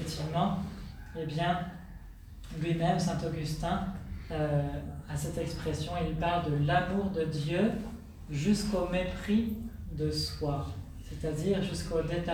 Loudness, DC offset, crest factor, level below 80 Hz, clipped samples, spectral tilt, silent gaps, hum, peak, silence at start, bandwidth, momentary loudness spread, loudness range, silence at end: -32 LUFS; under 0.1%; 18 dB; -44 dBFS; under 0.1%; -6 dB/octave; none; none; -14 dBFS; 0 s; 19.5 kHz; 13 LU; 3 LU; 0 s